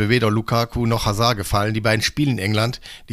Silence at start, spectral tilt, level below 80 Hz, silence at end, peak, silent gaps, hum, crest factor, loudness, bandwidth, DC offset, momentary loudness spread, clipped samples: 0 s; -5 dB/octave; -38 dBFS; 0 s; -2 dBFS; none; none; 18 dB; -20 LUFS; 16 kHz; under 0.1%; 3 LU; under 0.1%